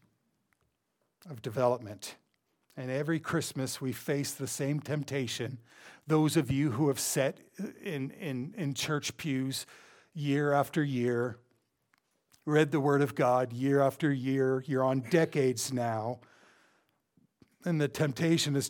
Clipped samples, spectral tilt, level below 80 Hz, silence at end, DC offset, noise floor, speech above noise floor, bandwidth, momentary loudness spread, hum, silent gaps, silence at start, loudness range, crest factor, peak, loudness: under 0.1%; -5.5 dB/octave; -70 dBFS; 0 s; under 0.1%; -80 dBFS; 49 dB; 19 kHz; 13 LU; none; none; 1.25 s; 6 LU; 20 dB; -10 dBFS; -31 LUFS